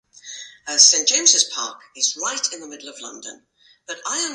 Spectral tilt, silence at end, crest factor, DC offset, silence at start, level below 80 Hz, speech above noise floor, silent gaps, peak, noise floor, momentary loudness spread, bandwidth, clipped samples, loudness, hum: 3 dB/octave; 0 s; 22 dB; under 0.1%; 0.25 s; -78 dBFS; 18 dB; none; 0 dBFS; -39 dBFS; 24 LU; 11.5 kHz; under 0.1%; -16 LUFS; none